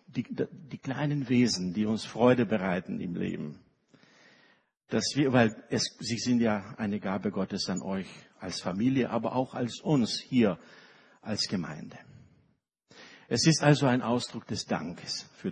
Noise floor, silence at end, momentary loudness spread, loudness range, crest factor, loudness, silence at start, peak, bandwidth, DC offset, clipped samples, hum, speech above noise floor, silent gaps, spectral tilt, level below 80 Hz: -72 dBFS; 0 s; 12 LU; 3 LU; 22 dB; -29 LUFS; 0.1 s; -8 dBFS; 10 kHz; under 0.1%; under 0.1%; none; 43 dB; none; -5 dB/octave; -66 dBFS